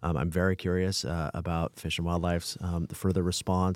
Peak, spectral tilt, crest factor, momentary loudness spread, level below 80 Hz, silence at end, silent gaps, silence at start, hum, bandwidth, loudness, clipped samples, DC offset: -12 dBFS; -5.5 dB/octave; 16 dB; 5 LU; -48 dBFS; 0 s; none; 0 s; none; 16 kHz; -30 LUFS; under 0.1%; under 0.1%